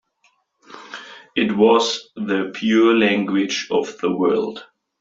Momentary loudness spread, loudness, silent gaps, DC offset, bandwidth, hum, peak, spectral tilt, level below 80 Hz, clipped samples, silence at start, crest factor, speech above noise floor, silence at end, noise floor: 20 LU; -19 LUFS; none; under 0.1%; 7.8 kHz; none; -2 dBFS; -4.5 dB/octave; -64 dBFS; under 0.1%; 0.7 s; 18 dB; 45 dB; 0.4 s; -63 dBFS